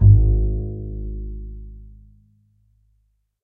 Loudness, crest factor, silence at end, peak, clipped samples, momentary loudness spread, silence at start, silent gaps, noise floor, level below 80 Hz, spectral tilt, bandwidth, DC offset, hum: -22 LUFS; 18 dB; 1.55 s; -2 dBFS; under 0.1%; 25 LU; 0 s; none; -66 dBFS; -24 dBFS; -16 dB/octave; 0.9 kHz; under 0.1%; none